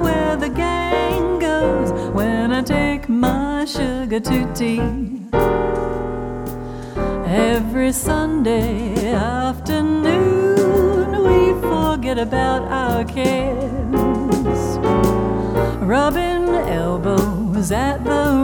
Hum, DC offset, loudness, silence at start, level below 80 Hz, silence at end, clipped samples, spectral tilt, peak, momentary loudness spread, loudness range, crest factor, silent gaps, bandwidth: none; under 0.1%; -18 LUFS; 0 s; -30 dBFS; 0 s; under 0.1%; -6 dB/octave; -2 dBFS; 6 LU; 4 LU; 16 dB; none; over 20 kHz